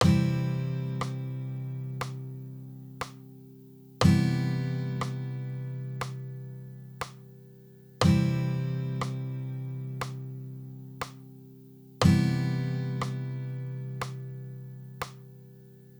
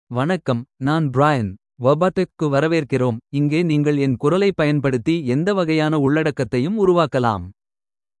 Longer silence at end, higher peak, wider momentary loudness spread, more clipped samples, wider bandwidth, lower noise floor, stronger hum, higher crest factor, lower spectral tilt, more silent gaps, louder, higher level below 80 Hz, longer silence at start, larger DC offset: second, 0 s vs 0.7 s; second, -8 dBFS vs -2 dBFS; first, 25 LU vs 5 LU; neither; first, over 20 kHz vs 11 kHz; second, -52 dBFS vs under -90 dBFS; neither; first, 22 dB vs 16 dB; about the same, -6.5 dB/octave vs -7.5 dB/octave; neither; second, -31 LUFS vs -19 LUFS; about the same, -54 dBFS vs -54 dBFS; about the same, 0 s vs 0.1 s; neither